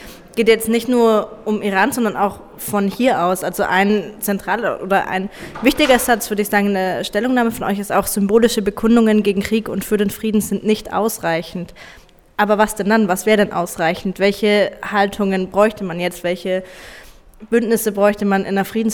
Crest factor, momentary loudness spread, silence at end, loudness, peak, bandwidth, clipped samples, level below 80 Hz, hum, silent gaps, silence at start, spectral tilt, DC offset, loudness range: 16 dB; 8 LU; 0 s; -17 LUFS; -2 dBFS; 20 kHz; under 0.1%; -44 dBFS; none; none; 0 s; -4.5 dB/octave; under 0.1%; 3 LU